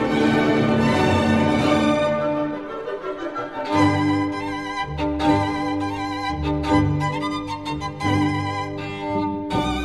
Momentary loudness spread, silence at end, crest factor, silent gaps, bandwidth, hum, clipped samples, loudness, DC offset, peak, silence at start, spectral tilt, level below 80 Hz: 10 LU; 0 s; 18 dB; none; 12 kHz; none; under 0.1%; -22 LUFS; 0.2%; -4 dBFS; 0 s; -6.5 dB/octave; -40 dBFS